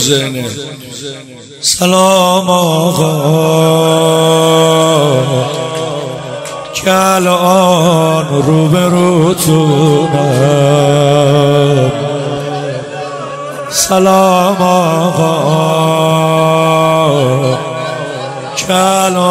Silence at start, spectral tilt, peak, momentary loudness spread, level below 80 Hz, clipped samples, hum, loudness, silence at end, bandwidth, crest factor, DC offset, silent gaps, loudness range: 0 s; -5 dB/octave; 0 dBFS; 13 LU; -48 dBFS; 0.3%; none; -10 LUFS; 0 s; 16.5 kHz; 10 dB; under 0.1%; none; 3 LU